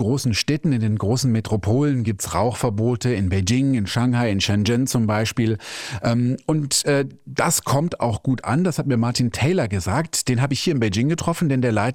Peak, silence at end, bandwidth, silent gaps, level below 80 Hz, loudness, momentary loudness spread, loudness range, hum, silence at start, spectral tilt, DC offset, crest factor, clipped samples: -4 dBFS; 0 s; 17 kHz; none; -50 dBFS; -21 LUFS; 4 LU; 1 LU; none; 0 s; -5 dB/octave; under 0.1%; 16 dB; under 0.1%